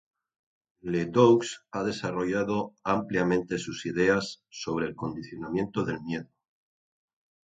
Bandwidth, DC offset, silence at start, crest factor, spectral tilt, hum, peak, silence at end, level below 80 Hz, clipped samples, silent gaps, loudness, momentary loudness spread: 9.2 kHz; under 0.1%; 0.85 s; 24 dB; -6 dB/octave; none; -6 dBFS; 1.25 s; -60 dBFS; under 0.1%; none; -28 LUFS; 14 LU